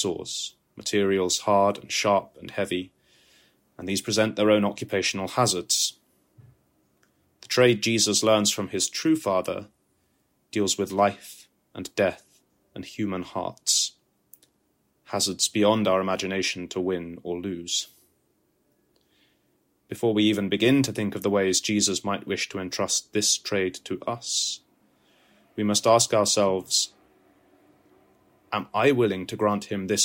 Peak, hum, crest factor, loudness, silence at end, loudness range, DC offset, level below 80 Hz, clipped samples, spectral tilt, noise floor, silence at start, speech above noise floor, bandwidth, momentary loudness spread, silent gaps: -6 dBFS; none; 20 dB; -24 LUFS; 0 s; 5 LU; under 0.1%; -68 dBFS; under 0.1%; -3 dB/octave; -70 dBFS; 0 s; 45 dB; 16.5 kHz; 12 LU; none